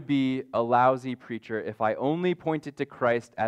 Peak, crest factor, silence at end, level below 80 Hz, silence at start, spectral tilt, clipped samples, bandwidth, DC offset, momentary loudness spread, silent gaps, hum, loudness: -10 dBFS; 18 dB; 0 s; -70 dBFS; 0 s; -7.5 dB/octave; under 0.1%; 9.8 kHz; under 0.1%; 12 LU; none; none; -27 LUFS